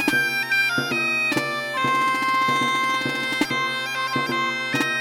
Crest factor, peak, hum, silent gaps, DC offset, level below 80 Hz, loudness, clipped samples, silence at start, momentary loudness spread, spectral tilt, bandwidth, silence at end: 16 dB; -8 dBFS; none; none; under 0.1%; -66 dBFS; -21 LUFS; under 0.1%; 0 s; 4 LU; -3 dB/octave; 19.5 kHz; 0 s